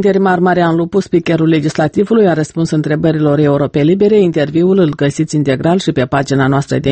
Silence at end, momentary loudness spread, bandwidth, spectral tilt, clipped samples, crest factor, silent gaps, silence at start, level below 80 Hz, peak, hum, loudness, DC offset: 0 s; 4 LU; 8.8 kHz; -7 dB/octave; under 0.1%; 12 dB; none; 0 s; -44 dBFS; 0 dBFS; none; -12 LUFS; under 0.1%